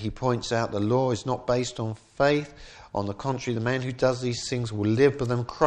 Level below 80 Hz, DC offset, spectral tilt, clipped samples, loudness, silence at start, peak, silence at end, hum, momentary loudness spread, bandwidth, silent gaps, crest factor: -52 dBFS; under 0.1%; -6 dB/octave; under 0.1%; -26 LUFS; 0 s; -6 dBFS; 0 s; none; 10 LU; 9.6 kHz; none; 20 dB